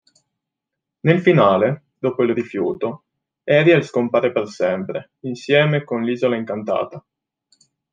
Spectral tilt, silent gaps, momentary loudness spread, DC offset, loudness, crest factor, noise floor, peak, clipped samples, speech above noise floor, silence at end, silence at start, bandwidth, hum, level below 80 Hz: -7.5 dB/octave; none; 15 LU; under 0.1%; -19 LUFS; 18 dB; -83 dBFS; -2 dBFS; under 0.1%; 65 dB; 0.95 s; 1.05 s; 7.6 kHz; none; -66 dBFS